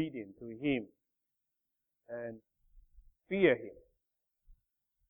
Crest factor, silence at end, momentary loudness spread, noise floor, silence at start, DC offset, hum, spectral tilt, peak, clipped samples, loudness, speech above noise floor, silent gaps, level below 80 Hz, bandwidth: 24 dB; 0.6 s; 22 LU; -87 dBFS; 0 s; under 0.1%; none; -9 dB/octave; -14 dBFS; under 0.1%; -34 LUFS; 53 dB; none; -68 dBFS; 3.9 kHz